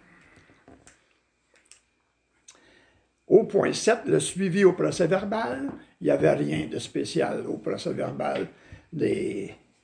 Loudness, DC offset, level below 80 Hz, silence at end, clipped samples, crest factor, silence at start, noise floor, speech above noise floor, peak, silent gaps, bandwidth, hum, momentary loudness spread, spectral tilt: -25 LUFS; under 0.1%; -62 dBFS; 0.3 s; under 0.1%; 22 dB; 3.3 s; -71 dBFS; 46 dB; -6 dBFS; none; 10.5 kHz; none; 11 LU; -5.5 dB/octave